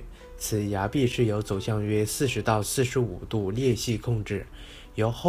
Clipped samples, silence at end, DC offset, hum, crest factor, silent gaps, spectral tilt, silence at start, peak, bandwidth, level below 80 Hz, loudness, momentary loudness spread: under 0.1%; 0 s; under 0.1%; none; 18 dB; none; -5.5 dB/octave; 0 s; -8 dBFS; 16 kHz; -44 dBFS; -27 LUFS; 10 LU